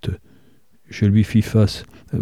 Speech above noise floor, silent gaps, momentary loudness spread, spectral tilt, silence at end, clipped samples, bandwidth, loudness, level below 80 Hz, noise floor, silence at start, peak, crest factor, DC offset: 39 dB; none; 17 LU; -7.5 dB/octave; 0 s; under 0.1%; 13.5 kHz; -19 LUFS; -42 dBFS; -57 dBFS; 0.05 s; -4 dBFS; 16 dB; 0.3%